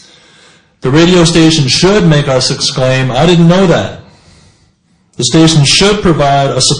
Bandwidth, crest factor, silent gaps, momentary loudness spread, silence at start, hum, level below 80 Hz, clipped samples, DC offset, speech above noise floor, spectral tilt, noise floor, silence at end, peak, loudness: 10.5 kHz; 10 dB; none; 5 LU; 0.85 s; none; -32 dBFS; 0.4%; under 0.1%; 44 dB; -4.5 dB/octave; -52 dBFS; 0 s; 0 dBFS; -8 LUFS